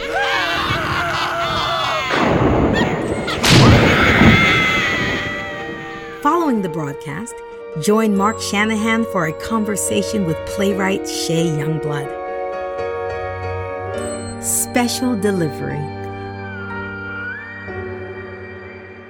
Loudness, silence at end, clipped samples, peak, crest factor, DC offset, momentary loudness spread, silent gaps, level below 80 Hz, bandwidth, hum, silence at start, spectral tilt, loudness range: -17 LUFS; 0 s; under 0.1%; 0 dBFS; 18 dB; under 0.1%; 17 LU; none; -36 dBFS; 18.5 kHz; none; 0 s; -4.5 dB/octave; 10 LU